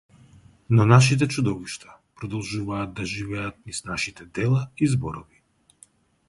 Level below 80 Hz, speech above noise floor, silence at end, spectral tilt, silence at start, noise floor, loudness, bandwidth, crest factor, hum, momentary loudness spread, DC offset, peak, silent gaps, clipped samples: -50 dBFS; 34 dB; 1.05 s; -6 dB/octave; 0.7 s; -57 dBFS; -24 LUFS; 11.5 kHz; 22 dB; none; 17 LU; under 0.1%; -2 dBFS; none; under 0.1%